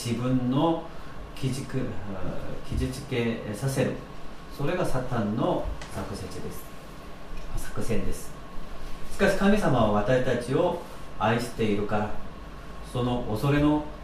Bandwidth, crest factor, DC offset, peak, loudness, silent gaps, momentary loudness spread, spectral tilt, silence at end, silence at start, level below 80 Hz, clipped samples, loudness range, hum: 15 kHz; 18 dB; under 0.1%; -10 dBFS; -28 LUFS; none; 20 LU; -6.5 dB/octave; 0 s; 0 s; -38 dBFS; under 0.1%; 7 LU; none